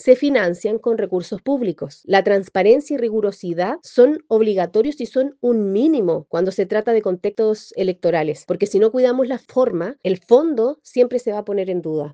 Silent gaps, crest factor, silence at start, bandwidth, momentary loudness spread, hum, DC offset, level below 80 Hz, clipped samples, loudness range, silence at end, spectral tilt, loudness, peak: none; 18 dB; 0.05 s; 9 kHz; 8 LU; none; under 0.1%; -64 dBFS; under 0.1%; 2 LU; 0 s; -6.5 dB/octave; -19 LUFS; 0 dBFS